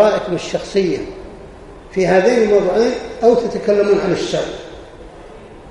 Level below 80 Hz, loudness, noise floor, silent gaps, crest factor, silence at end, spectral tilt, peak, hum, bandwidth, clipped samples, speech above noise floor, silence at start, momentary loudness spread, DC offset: -42 dBFS; -16 LUFS; -37 dBFS; none; 16 dB; 0 s; -5.5 dB/octave; 0 dBFS; none; 11 kHz; under 0.1%; 21 dB; 0 s; 22 LU; under 0.1%